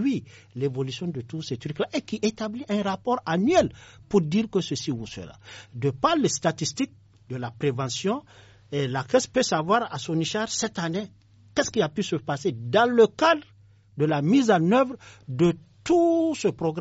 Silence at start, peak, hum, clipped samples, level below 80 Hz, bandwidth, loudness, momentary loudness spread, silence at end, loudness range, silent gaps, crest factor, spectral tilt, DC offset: 0 s; -6 dBFS; none; under 0.1%; -58 dBFS; 8 kHz; -25 LUFS; 13 LU; 0 s; 5 LU; none; 20 dB; -5 dB/octave; under 0.1%